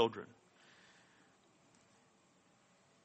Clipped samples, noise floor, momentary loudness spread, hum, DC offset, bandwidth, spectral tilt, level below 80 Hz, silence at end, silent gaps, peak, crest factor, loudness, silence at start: under 0.1%; -71 dBFS; 17 LU; none; under 0.1%; 8.4 kHz; -5 dB/octave; under -90 dBFS; 2.8 s; none; -18 dBFS; 28 dB; -41 LUFS; 0 s